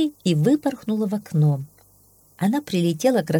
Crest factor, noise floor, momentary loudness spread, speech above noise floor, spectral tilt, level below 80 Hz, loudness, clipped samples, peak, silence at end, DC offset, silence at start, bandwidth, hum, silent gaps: 16 dB; -55 dBFS; 6 LU; 35 dB; -7 dB/octave; -64 dBFS; -22 LUFS; under 0.1%; -6 dBFS; 0 s; under 0.1%; 0 s; 18 kHz; none; none